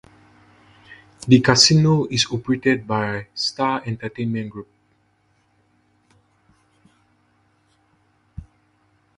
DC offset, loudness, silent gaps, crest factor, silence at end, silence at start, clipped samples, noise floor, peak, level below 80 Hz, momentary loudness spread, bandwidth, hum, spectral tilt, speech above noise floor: under 0.1%; -18 LUFS; none; 22 dB; 0.75 s; 0.9 s; under 0.1%; -63 dBFS; 0 dBFS; -52 dBFS; 22 LU; 11 kHz; none; -4.5 dB/octave; 44 dB